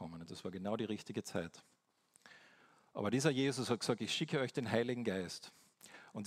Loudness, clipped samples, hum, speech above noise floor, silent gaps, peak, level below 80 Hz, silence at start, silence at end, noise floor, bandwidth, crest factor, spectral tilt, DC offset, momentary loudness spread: -39 LUFS; under 0.1%; none; 35 dB; none; -18 dBFS; -78 dBFS; 0 s; 0 s; -73 dBFS; 15.5 kHz; 22 dB; -5 dB/octave; under 0.1%; 16 LU